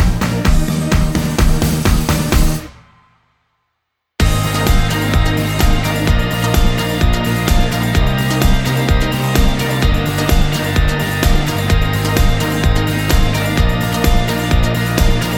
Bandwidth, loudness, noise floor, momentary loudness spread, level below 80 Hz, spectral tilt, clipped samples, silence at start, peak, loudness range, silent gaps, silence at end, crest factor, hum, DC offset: over 20 kHz; -15 LUFS; -72 dBFS; 1 LU; -16 dBFS; -5 dB/octave; under 0.1%; 0 s; 0 dBFS; 3 LU; none; 0 s; 14 dB; none; under 0.1%